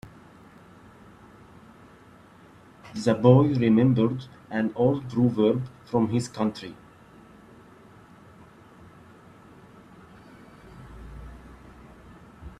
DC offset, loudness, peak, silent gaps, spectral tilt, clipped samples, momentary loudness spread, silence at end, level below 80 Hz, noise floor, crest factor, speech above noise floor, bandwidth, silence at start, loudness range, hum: under 0.1%; -23 LUFS; -2 dBFS; none; -8 dB/octave; under 0.1%; 27 LU; 0.1 s; -54 dBFS; -52 dBFS; 24 dB; 30 dB; 10.5 kHz; 0.05 s; 12 LU; none